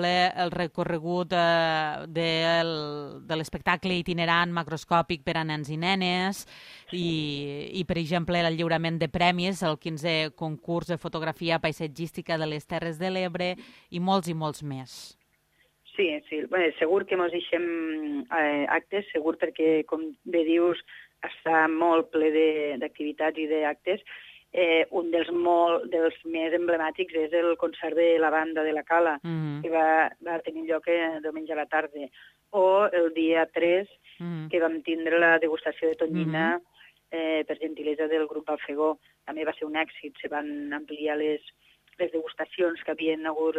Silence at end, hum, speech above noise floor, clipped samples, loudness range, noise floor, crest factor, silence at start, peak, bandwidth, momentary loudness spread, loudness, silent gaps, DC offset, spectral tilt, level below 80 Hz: 0 s; none; 41 dB; under 0.1%; 5 LU; -68 dBFS; 20 dB; 0 s; -8 dBFS; 14 kHz; 11 LU; -27 LUFS; none; under 0.1%; -6 dB/octave; -62 dBFS